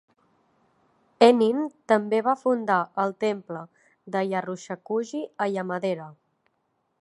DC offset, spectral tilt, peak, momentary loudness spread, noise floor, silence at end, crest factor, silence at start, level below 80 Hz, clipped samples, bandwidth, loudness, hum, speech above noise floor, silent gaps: under 0.1%; -6 dB/octave; -2 dBFS; 15 LU; -74 dBFS; 0.9 s; 24 dB; 1.2 s; -80 dBFS; under 0.1%; 11.5 kHz; -25 LUFS; none; 49 dB; none